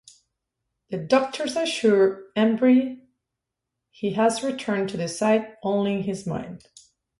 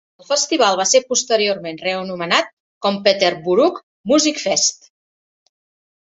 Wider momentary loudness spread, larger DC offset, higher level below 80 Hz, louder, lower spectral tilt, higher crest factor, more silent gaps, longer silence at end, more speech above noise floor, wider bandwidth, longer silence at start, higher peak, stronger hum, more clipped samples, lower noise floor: first, 14 LU vs 8 LU; neither; about the same, -64 dBFS vs -64 dBFS; second, -23 LUFS vs -17 LUFS; first, -5.5 dB/octave vs -2 dB/octave; about the same, 18 dB vs 18 dB; second, none vs 2.53-2.81 s, 3.83-4.04 s; second, 0.6 s vs 1.4 s; second, 61 dB vs over 73 dB; first, 11.5 kHz vs 8.2 kHz; first, 0.9 s vs 0.3 s; second, -6 dBFS vs -2 dBFS; neither; neither; second, -84 dBFS vs under -90 dBFS